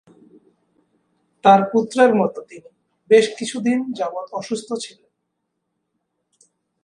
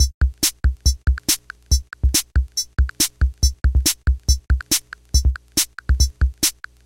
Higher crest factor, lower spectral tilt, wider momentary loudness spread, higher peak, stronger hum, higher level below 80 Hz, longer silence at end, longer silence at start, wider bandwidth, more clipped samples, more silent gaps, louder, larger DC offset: about the same, 20 dB vs 18 dB; first, -5 dB/octave vs -2.5 dB/octave; first, 15 LU vs 4 LU; about the same, 0 dBFS vs -2 dBFS; neither; second, -70 dBFS vs -20 dBFS; first, 1.95 s vs 0.35 s; first, 1.45 s vs 0 s; second, 11 kHz vs 17 kHz; neither; second, none vs 0.14-0.21 s; about the same, -18 LUFS vs -20 LUFS; second, under 0.1% vs 0.2%